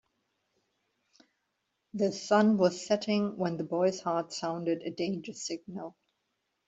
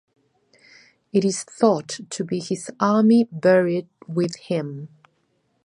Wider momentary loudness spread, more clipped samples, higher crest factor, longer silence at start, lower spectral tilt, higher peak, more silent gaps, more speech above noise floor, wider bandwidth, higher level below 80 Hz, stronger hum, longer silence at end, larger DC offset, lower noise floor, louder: about the same, 14 LU vs 12 LU; neither; about the same, 20 dB vs 18 dB; first, 1.95 s vs 1.15 s; about the same, -5.5 dB/octave vs -6 dB/octave; second, -12 dBFS vs -4 dBFS; neither; first, 51 dB vs 47 dB; second, 8 kHz vs 11 kHz; about the same, -76 dBFS vs -72 dBFS; neither; about the same, 0.75 s vs 0.8 s; neither; first, -81 dBFS vs -68 dBFS; second, -30 LUFS vs -21 LUFS